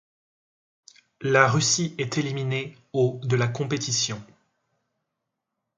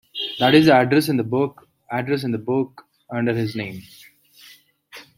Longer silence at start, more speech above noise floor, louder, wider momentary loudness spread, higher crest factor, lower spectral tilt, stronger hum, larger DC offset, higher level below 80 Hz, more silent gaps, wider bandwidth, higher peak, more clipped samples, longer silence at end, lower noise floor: first, 1.2 s vs 0.15 s; first, 58 dB vs 31 dB; second, -24 LUFS vs -20 LUFS; second, 11 LU vs 16 LU; about the same, 24 dB vs 20 dB; second, -4 dB/octave vs -6 dB/octave; neither; neither; about the same, -64 dBFS vs -62 dBFS; neither; second, 9.6 kHz vs 16.5 kHz; about the same, -2 dBFS vs -2 dBFS; neither; first, 1.55 s vs 0.15 s; first, -82 dBFS vs -50 dBFS